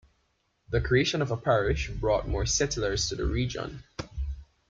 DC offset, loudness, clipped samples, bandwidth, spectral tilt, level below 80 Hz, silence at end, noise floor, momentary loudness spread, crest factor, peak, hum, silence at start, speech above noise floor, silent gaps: under 0.1%; -28 LUFS; under 0.1%; 9.4 kHz; -4.5 dB/octave; -38 dBFS; 0.25 s; -73 dBFS; 13 LU; 18 dB; -12 dBFS; none; 0.7 s; 45 dB; none